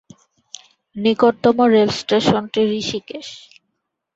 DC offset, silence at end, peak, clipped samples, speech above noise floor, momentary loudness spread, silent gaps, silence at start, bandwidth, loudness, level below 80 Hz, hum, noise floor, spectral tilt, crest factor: under 0.1%; 0.8 s; -2 dBFS; under 0.1%; 58 dB; 24 LU; none; 0.95 s; 8 kHz; -17 LUFS; -56 dBFS; none; -75 dBFS; -5 dB/octave; 18 dB